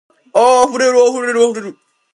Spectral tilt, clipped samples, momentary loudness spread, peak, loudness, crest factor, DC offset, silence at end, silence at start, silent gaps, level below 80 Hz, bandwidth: -2.5 dB/octave; under 0.1%; 11 LU; 0 dBFS; -12 LUFS; 14 dB; under 0.1%; 0.45 s; 0.35 s; none; -62 dBFS; 11.5 kHz